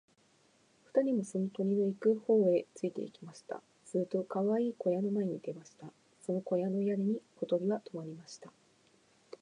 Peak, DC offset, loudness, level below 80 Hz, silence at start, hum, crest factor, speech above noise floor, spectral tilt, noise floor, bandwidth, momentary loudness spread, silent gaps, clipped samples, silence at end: -16 dBFS; under 0.1%; -34 LUFS; -86 dBFS; 0.95 s; none; 18 dB; 35 dB; -8 dB/octave; -69 dBFS; 10.5 kHz; 17 LU; none; under 0.1%; 0.95 s